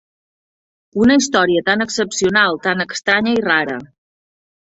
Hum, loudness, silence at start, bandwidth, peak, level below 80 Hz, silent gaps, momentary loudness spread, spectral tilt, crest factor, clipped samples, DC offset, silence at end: none; -15 LUFS; 0.95 s; 8 kHz; 0 dBFS; -52 dBFS; none; 6 LU; -3.5 dB/octave; 16 dB; under 0.1%; under 0.1%; 0.85 s